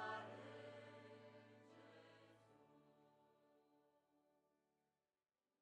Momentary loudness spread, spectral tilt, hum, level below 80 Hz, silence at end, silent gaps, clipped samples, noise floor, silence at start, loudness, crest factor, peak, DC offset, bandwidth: 14 LU; -5 dB/octave; none; under -90 dBFS; 1.2 s; none; under 0.1%; under -90 dBFS; 0 s; -59 LUFS; 24 dB; -38 dBFS; under 0.1%; 9.6 kHz